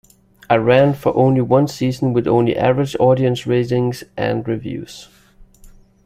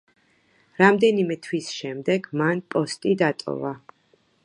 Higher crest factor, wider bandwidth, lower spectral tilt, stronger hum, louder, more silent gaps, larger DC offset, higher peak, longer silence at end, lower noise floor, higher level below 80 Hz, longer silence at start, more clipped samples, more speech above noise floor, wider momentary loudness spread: second, 16 dB vs 22 dB; first, 15 kHz vs 11 kHz; first, -7.5 dB/octave vs -5.5 dB/octave; neither; first, -17 LUFS vs -23 LUFS; neither; neither; about the same, 0 dBFS vs -2 dBFS; second, 0.35 s vs 0.7 s; second, -45 dBFS vs -63 dBFS; first, -48 dBFS vs -70 dBFS; second, 0.5 s vs 0.8 s; neither; second, 29 dB vs 41 dB; second, 10 LU vs 13 LU